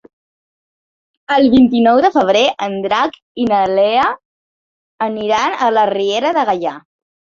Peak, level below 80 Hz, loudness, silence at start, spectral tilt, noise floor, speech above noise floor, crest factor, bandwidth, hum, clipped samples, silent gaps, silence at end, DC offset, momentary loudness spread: 0 dBFS; -50 dBFS; -14 LUFS; 1.3 s; -5 dB/octave; under -90 dBFS; over 77 dB; 14 dB; 7.2 kHz; none; under 0.1%; 3.22-3.35 s, 4.25-4.98 s; 0.6 s; under 0.1%; 10 LU